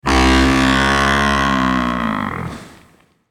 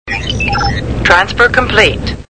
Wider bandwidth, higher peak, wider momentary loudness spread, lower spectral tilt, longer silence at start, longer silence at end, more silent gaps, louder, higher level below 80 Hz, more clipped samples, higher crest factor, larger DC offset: first, 15 kHz vs 11 kHz; about the same, -2 dBFS vs 0 dBFS; first, 13 LU vs 7 LU; about the same, -4.5 dB/octave vs -4.5 dB/octave; about the same, 0.05 s vs 0.05 s; first, 0.65 s vs 0.05 s; neither; second, -15 LUFS vs -11 LUFS; about the same, -26 dBFS vs -24 dBFS; second, under 0.1% vs 0.5%; about the same, 14 dB vs 12 dB; second, under 0.1% vs 2%